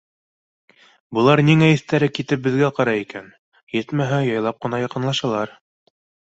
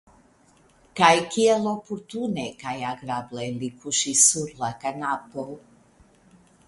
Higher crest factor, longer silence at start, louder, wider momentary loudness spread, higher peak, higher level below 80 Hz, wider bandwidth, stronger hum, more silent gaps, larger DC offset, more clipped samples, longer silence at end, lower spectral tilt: second, 18 dB vs 24 dB; first, 1.1 s vs 0.95 s; first, -19 LUFS vs -23 LUFS; second, 13 LU vs 17 LU; about the same, -2 dBFS vs -2 dBFS; first, -58 dBFS vs -64 dBFS; second, 8 kHz vs 11.5 kHz; neither; first, 3.39-3.52 s, 3.63-3.67 s vs none; neither; neither; second, 0.9 s vs 1.1 s; first, -6.5 dB/octave vs -2.5 dB/octave